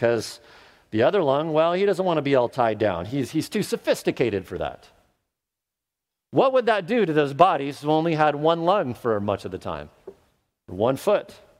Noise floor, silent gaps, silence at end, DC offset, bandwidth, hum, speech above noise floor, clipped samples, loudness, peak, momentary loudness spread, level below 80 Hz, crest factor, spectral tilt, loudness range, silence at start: -86 dBFS; none; 0.25 s; under 0.1%; 16 kHz; none; 64 dB; under 0.1%; -23 LUFS; 0 dBFS; 12 LU; -58 dBFS; 22 dB; -6 dB/octave; 5 LU; 0 s